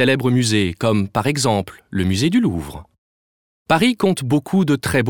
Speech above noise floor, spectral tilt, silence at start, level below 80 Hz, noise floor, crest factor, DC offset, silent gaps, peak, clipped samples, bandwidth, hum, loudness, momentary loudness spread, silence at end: over 72 dB; -5.5 dB/octave; 0 s; -46 dBFS; under -90 dBFS; 18 dB; under 0.1%; 2.98-3.65 s; 0 dBFS; under 0.1%; 19 kHz; none; -18 LUFS; 6 LU; 0 s